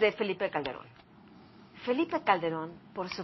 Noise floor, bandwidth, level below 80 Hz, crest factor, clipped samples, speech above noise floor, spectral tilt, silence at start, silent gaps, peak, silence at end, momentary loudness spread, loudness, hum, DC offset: -55 dBFS; 6 kHz; -68 dBFS; 22 dB; under 0.1%; 24 dB; -3 dB/octave; 0 s; none; -10 dBFS; 0 s; 12 LU; -32 LUFS; none; under 0.1%